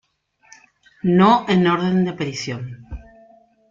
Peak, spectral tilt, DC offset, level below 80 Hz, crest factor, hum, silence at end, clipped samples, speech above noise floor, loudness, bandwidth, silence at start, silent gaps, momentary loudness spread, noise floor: -2 dBFS; -6.5 dB/octave; under 0.1%; -46 dBFS; 20 dB; none; 0.7 s; under 0.1%; 41 dB; -18 LUFS; 7.6 kHz; 1.05 s; none; 22 LU; -59 dBFS